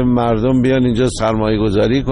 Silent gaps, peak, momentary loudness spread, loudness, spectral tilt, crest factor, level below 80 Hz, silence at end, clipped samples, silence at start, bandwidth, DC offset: none; -4 dBFS; 2 LU; -15 LUFS; -7 dB/octave; 10 dB; -30 dBFS; 0 s; under 0.1%; 0 s; 11 kHz; under 0.1%